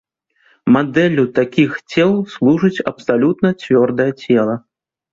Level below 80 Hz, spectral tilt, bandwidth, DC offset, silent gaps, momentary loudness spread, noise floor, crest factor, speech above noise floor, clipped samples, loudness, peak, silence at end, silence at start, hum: -56 dBFS; -7.5 dB/octave; 7.4 kHz; under 0.1%; none; 5 LU; -57 dBFS; 14 dB; 43 dB; under 0.1%; -15 LUFS; -2 dBFS; 0.55 s; 0.65 s; none